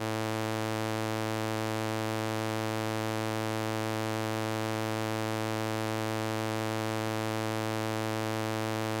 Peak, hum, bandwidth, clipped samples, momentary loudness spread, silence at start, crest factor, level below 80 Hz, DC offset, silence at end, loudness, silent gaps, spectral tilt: -16 dBFS; none; 17 kHz; under 0.1%; 0 LU; 0 s; 16 dB; -70 dBFS; under 0.1%; 0 s; -32 LUFS; none; -5 dB/octave